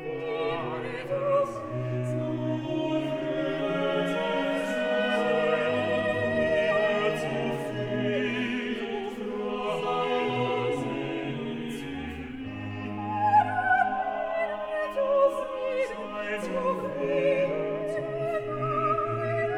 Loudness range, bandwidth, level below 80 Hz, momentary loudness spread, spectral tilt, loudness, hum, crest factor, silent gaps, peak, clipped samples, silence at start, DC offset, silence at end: 4 LU; 14 kHz; -58 dBFS; 9 LU; -6.5 dB/octave; -28 LUFS; none; 16 dB; none; -12 dBFS; under 0.1%; 0 s; under 0.1%; 0 s